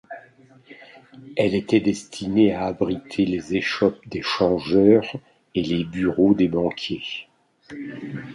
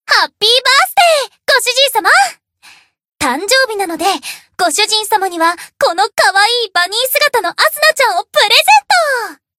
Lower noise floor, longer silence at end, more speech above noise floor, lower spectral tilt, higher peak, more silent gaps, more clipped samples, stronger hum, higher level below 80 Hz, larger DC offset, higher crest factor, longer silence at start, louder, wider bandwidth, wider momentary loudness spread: first, -52 dBFS vs -44 dBFS; second, 0 s vs 0.25 s; about the same, 30 dB vs 32 dB; first, -6.5 dB/octave vs 0.5 dB/octave; about the same, -2 dBFS vs 0 dBFS; neither; second, under 0.1% vs 0.1%; neither; first, -52 dBFS vs -58 dBFS; neither; first, 20 dB vs 12 dB; about the same, 0.1 s vs 0.1 s; second, -22 LUFS vs -11 LUFS; second, 11.5 kHz vs 17.5 kHz; first, 16 LU vs 8 LU